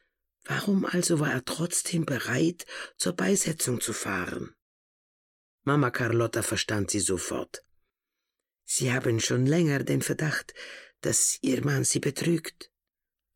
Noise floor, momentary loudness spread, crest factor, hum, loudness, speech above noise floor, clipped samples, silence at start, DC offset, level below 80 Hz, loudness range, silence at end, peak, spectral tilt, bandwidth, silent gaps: -89 dBFS; 11 LU; 16 dB; none; -27 LUFS; 61 dB; under 0.1%; 0.45 s; under 0.1%; -62 dBFS; 3 LU; 0.7 s; -12 dBFS; -4 dB/octave; 17 kHz; 4.62-5.58 s